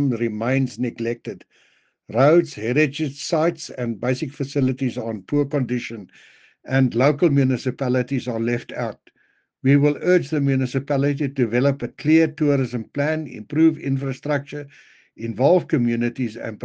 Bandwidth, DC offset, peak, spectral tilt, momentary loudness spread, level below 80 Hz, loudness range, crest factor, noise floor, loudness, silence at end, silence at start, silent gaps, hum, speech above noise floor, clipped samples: 9 kHz; under 0.1%; -4 dBFS; -7.5 dB/octave; 10 LU; -62 dBFS; 3 LU; 18 dB; -65 dBFS; -21 LUFS; 0 s; 0 s; none; none; 44 dB; under 0.1%